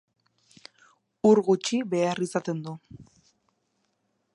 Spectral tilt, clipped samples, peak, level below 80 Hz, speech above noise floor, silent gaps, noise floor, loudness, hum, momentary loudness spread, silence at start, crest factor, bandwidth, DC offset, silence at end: -5.5 dB/octave; under 0.1%; -8 dBFS; -70 dBFS; 50 dB; none; -75 dBFS; -25 LUFS; none; 15 LU; 1.25 s; 20 dB; 11.5 kHz; under 0.1%; 1.3 s